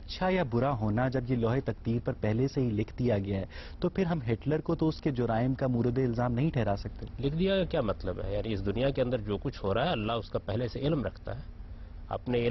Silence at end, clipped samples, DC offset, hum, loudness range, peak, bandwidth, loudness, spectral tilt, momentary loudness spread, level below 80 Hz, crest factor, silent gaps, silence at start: 0 s; under 0.1%; under 0.1%; none; 2 LU; -16 dBFS; 6 kHz; -31 LUFS; -8.5 dB/octave; 7 LU; -44 dBFS; 14 dB; none; 0 s